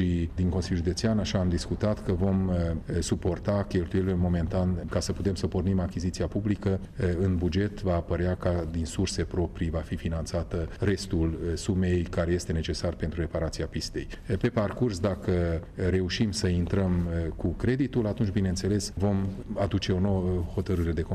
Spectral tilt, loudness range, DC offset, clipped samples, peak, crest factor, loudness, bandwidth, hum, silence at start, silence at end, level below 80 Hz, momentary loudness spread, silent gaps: -6.5 dB/octave; 2 LU; under 0.1%; under 0.1%; -16 dBFS; 12 dB; -29 LUFS; 12.5 kHz; none; 0 s; 0 s; -40 dBFS; 5 LU; none